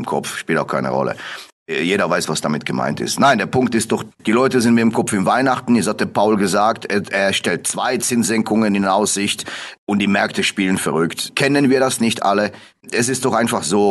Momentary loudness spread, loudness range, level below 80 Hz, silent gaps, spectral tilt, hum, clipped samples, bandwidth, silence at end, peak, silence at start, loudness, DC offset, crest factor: 7 LU; 2 LU; -54 dBFS; 1.52-1.66 s, 9.78-9.87 s; -4 dB/octave; none; under 0.1%; 12.5 kHz; 0 s; 0 dBFS; 0 s; -17 LUFS; under 0.1%; 16 dB